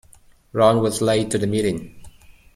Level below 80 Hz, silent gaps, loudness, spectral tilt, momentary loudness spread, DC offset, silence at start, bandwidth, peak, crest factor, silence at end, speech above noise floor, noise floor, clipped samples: -50 dBFS; none; -20 LUFS; -5.5 dB/octave; 11 LU; under 0.1%; 0.55 s; 16 kHz; -2 dBFS; 18 dB; 0.25 s; 32 dB; -51 dBFS; under 0.1%